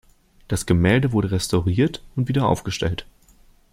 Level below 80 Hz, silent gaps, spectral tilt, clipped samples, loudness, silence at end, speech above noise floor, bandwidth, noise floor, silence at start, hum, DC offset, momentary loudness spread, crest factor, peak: -42 dBFS; none; -6 dB/octave; under 0.1%; -21 LUFS; 0.7 s; 33 dB; 15.5 kHz; -53 dBFS; 0.5 s; none; under 0.1%; 9 LU; 18 dB; -4 dBFS